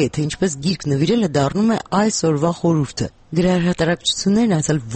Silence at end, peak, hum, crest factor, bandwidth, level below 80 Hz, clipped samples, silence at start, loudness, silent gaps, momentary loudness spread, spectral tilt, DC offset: 0 s; -6 dBFS; none; 12 dB; 8.8 kHz; -44 dBFS; under 0.1%; 0 s; -18 LUFS; none; 4 LU; -5.5 dB/octave; under 0.1%